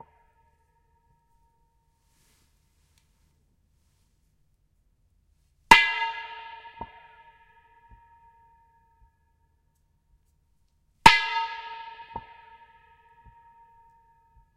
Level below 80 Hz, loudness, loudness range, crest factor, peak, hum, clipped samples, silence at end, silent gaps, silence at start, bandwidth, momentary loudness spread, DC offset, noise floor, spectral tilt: -52 dBFS; -20 LUFS; 13 LU; 30 dB; 0 dBFS; none; under 0.1%; 2.4 s; none; 5.7 s; 16 kHz; 27 LU; under 0.1%; -69 dBFS; -2 dB/octave